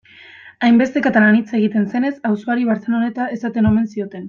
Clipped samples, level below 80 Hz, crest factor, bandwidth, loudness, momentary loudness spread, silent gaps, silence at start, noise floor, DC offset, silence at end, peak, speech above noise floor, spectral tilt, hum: under 0.1%; -50 dBFS; 14 dB; 7 kHz; -17 LUFS; 8 LU; none; 0.45 s; -42 dBFS; under 0.1%; 0 s; -2 dBFS; 26 dB; -7.5 dB/octave; none